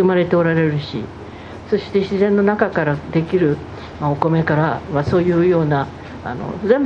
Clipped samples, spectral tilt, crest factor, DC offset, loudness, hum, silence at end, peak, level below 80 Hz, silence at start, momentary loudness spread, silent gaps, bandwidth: under 0.1%; -8.5 dB/octave; 18 dB; under 0.1%; -18 LUFS; none; 0 s; 0 dBFS; -44 dBFS; 0 s; 13 LU; none; 7.2 kHz